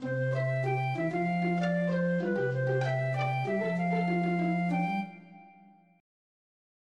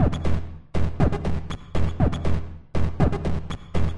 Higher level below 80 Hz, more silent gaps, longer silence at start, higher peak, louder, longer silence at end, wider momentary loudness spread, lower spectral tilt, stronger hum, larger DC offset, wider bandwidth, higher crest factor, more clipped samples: second, -76 dBFS vs -30 dBFS; neither; about the same, 0 s vs 0 s; second, -18 dBFS vs -6 dBFS; second, -30 LUFS vs -27 LUFS; first, 1.5 s vs 0 s; second, 2 LU vs 8 LU; about the same, -8.5 dB/octave vs -8 dB/octave; neither; second, under 0.1% vs 3%; second, 7.8 kHz vs 10.5 kHz; about the same, 12 dB vs 16 dB; neither